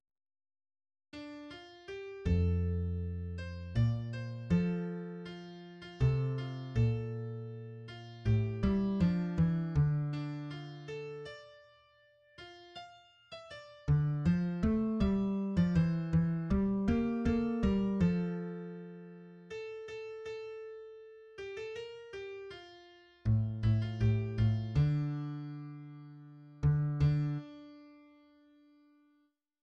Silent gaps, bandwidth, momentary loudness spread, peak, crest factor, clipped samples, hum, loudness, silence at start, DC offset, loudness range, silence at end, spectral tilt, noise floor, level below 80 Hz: none; 7.4 kHz; 19 LU; -18 dBFS; 16 dB; under 0.1%; none; -34 LUFS; 1.15 s; under 0.1%; 13 LU; 1.65 s; -9 dB/octave; -75 dBFS; -48 dBFS